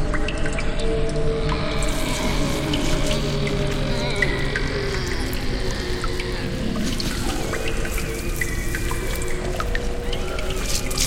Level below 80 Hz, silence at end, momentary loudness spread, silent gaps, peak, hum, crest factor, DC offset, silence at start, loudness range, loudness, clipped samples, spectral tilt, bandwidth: -26 dBFS; 0 s; 4 LU; none; -6 dBFS; none; 16 dB; under 0.1%; 0 s; 3 LU; -25 LUFS; under 0.1%; -4.5 dB/octave; 16.5 kHz